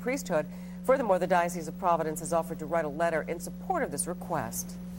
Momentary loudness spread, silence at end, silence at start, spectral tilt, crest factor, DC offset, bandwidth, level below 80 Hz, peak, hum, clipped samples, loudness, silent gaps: 9 LU; 0 s; 0 s; -5 dB/octave; 18 dB; under 0.1%; 16.5 kHz; -54 dBFS; -12 dBFS; 60 Hz at -40 dBFS; under 0.1%; -30 LUFS; none